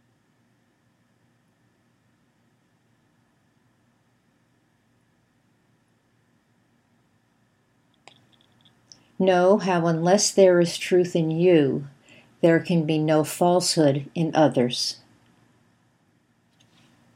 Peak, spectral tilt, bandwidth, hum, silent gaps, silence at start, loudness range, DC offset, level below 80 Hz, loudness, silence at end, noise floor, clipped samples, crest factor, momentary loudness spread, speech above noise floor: -4 dBFS; -5 dB/octave; 16 kHz; none; none; 9.2 s; 6 LU; under 0.1%; -76 dBFS; -21 LUFS; 2.2 s; -66 dBFS; under 0.1%; 20 dB; 8 LU; 45 dB